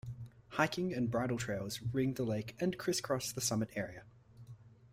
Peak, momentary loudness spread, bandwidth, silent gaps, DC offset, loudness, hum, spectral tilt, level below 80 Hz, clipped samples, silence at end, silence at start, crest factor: -16 dBFS; 15 LU; 16 kHz; none; under 0.1%; -36 LUFS; none; -4.5 dB/octave; -64 dBFS; under 0.1%; 0.05 s; 0.05 s; 22 dB